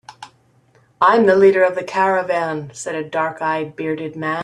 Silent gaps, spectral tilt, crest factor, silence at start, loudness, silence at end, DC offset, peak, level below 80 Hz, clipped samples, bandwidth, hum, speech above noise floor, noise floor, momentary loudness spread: none; -5.5 dB/octave; 16 dB; 0.1 s; -17 LUFS; 0 s; under 0.1%; -2 dBFS; -64 dBFS; under 0.1%; 10.5 kHz; none; 38 dB; -55 dBFS; 12 LU